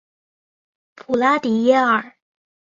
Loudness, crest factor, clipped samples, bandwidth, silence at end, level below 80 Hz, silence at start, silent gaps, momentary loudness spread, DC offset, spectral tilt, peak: -18 LUFS; 18 dB; under 0.1%; 7.6 kHz; 0.6 s; -66 dBFS; 1.1 s; none; 6 LU; under 0.1%; -5.5 dB/octave; -2 dBFS